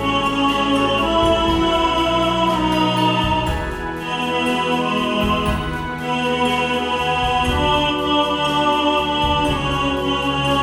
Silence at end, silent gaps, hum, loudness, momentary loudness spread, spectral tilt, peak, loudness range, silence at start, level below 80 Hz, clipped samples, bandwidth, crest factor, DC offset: 0 s; none; none; -18 LUFS; 5 LU; -5 dB/octave; -4 dBFS; 3 LU; 0 s; -32 dBFS; under 0.1%; 17.5 kHz; 14 dB; under 0.1%